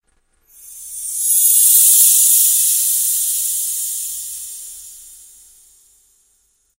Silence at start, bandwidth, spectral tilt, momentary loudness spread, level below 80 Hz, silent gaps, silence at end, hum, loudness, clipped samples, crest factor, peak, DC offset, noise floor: 0.65 s; over 20 kHz; 6 dB/octave; 22 LU; -60 dBFS; none; 1.8 s; none; -11 LUFS; under 0.1%; 18 dB; 0 dBFS; under 0.1%; -61 dBFS